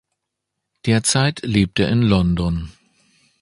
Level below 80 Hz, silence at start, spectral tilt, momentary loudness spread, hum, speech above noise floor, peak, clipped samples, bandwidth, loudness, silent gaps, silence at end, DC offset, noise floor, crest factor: -36 dBFS; 0.85 s; -5 dB/octave; 11 LU; none; 62 dB; -2 dBFS; under 0.1%; 11.5 kHz; -18 LUFS; none; 0.7 s; under 0.1%; -79 dBFS; 18 dB